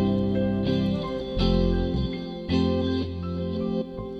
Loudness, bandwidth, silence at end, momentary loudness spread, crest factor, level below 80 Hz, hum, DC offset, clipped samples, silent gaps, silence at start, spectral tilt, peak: -26 LUFS; 7.8 kHz; 0 s; 7 LU; 14 dB; -34 dBFS; none; under 0.1%; under 0.1%; none; 0 s; -8.5 dB/octave; -10 dBFS